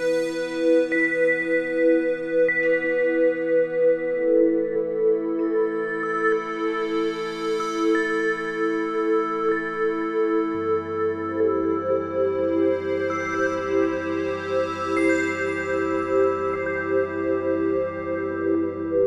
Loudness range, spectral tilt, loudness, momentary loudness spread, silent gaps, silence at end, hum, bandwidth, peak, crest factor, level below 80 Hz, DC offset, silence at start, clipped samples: 3 LU; -6 dB/octave; -23 LUFS; 5 LU; none; 0 s; none; 10.5 kHz; -8 dBFS; 14 dB; -62 dBFS; under 0.1%; 0 s; under 0.1%